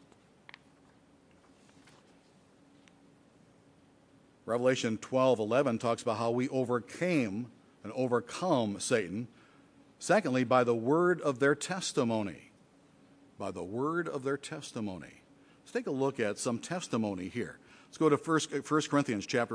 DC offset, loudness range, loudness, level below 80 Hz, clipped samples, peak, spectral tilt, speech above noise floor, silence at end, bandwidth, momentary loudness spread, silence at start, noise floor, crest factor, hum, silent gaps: under 0.1%; 7 LU; -32 LUFS; -76 dBFS; under 0.1%; -12 dBFS; -5 dB/octave; 32 dB; 0 s; 10.5 kHz; 13 LU; 4.45 s; -63 dBFS; 22 dB; none; none